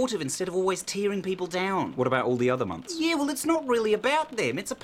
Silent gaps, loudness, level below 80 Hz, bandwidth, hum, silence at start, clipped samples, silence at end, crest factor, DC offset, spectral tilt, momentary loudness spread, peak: none; -27 LUFS; -64 dBFS; 16.5 kHz; none; 0 s; under 0.1%; 0.05 s; 18 dB; under 0.1%; -4 dB/octave; 5 LU; -10 dBFS